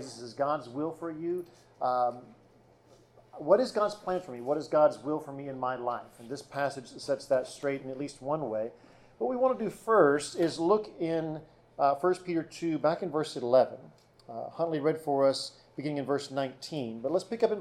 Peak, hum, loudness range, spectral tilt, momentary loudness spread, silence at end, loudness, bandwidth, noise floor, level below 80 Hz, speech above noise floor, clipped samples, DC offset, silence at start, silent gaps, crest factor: -10 dBFS; none; 5 LU; -5.5 dB/octave; 14 LU; 0 s; -31 LUFS; 13.5 kHz; -61 dBFS; -70 dBFS; 31 dB; under 0.1%; under 0.1%; 0 s; none; 20 dB